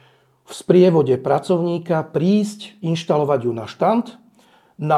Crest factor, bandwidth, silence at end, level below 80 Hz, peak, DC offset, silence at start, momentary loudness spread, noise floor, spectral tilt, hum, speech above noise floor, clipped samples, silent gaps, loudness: 18 dB; 12.5 kHz; 0 s; -66 dBFS; -2 dBFS; under 0.1%; 0.5 s; 14 LU; -54 dBFS; -7.5 dB/octave; none; 36 dB; under 0.1%; none; -19 LUFS